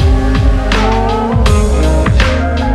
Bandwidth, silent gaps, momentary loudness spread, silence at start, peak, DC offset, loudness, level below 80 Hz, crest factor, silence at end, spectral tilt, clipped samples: 12 kHz; none; 2 LU; 0 s; 0 dBFS; under 0.1%; -12 LUFS; -12 dBFS; 10 dB; 0 s; -6 dB/octave; under 0.1%